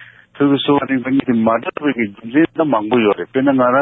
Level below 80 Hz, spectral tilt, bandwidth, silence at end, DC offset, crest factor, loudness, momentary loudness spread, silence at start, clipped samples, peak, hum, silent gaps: -56 dBFS; -10 dB/octave; 4 kHz; 0 s; under 0.1%; 14 dB; -16 LUFS; 5 LU; 0 s; under 0.1%; -2 dBFS; none; none